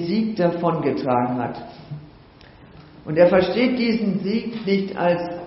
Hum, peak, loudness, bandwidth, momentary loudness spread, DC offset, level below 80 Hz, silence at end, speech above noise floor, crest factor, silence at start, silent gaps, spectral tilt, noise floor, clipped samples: none; -2 dBFS; -21 LUFS; 6 kHz; 20 LU; under 0.1%; -54 dBFS; 0 s; 27 dB; 18 dB; 0 s; none; -5.5 dB/octave; -47 dBFS; under 0.1%